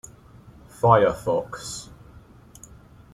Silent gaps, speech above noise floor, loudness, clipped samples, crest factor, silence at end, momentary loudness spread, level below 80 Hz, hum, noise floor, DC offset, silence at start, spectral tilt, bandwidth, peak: none; 28 dB; -22 LUFS; under 0.1%; 24 dB; 1.3 s; 24 LU; -50 dBFS; none; -48 dBFS; under 0.1%; 0.85 s; -5.5 dB/octave; 14 kHz; -2 dBFS